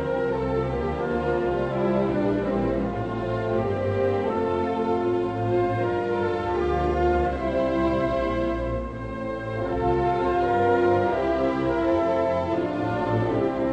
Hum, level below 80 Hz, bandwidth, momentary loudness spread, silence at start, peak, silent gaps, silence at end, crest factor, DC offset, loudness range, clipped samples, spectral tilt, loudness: none; -40 dBFS; 8.4 kHz; 5 LU; 0 s; -10 dBFS; none; 0 s; 14 dB; 0.1%; 2 LU; under 0.1%; -8.5 dB/octave; -24 LUFS